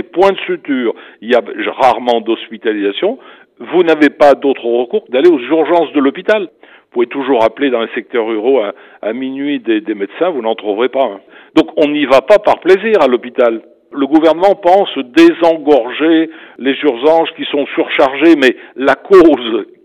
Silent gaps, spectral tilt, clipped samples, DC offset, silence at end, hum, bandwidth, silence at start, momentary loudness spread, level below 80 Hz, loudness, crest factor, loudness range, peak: none; -5.5 dB/octave; 0.3%; under 0.1%; 0.2 s; none; 9.2 kHz; 0.15 s; 11 LU; -52 dBFS; -12 LUFS; 12 dB; 5 LU; 0 dBFS